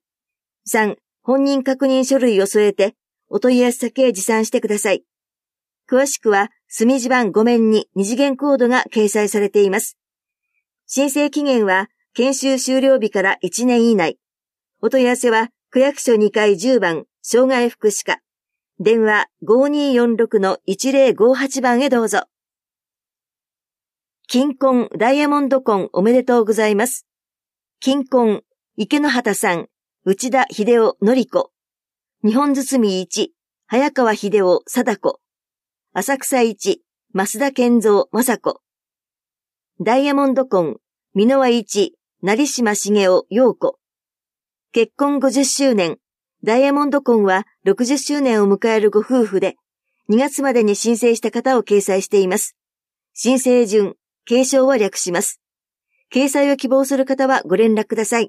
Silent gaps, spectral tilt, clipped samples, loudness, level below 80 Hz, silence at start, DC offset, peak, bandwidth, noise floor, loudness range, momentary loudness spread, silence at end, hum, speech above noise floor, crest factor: none; -4 dB/octave; under 0.1%; -17 LUFS; -72 dBFS; 0.65 s; under 0.1%; -2 dBFS; 15.5 kHz; under -90 dBFS; 3 LU; 8 LU; 0 s; none; over 74 dB; 14 dB